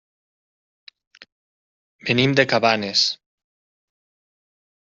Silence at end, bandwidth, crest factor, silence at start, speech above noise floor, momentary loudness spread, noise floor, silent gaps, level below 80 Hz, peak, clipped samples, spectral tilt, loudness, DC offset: 1.65 s; 7.8 kHz; 22 dB; 2.05 s; over 71 dB; 11 LU; under -90 dBFS; none; -62 dBFS; -2 dBFS; under 0.1%; -2.5 dB/octave; -18 LUFS; under 0.1%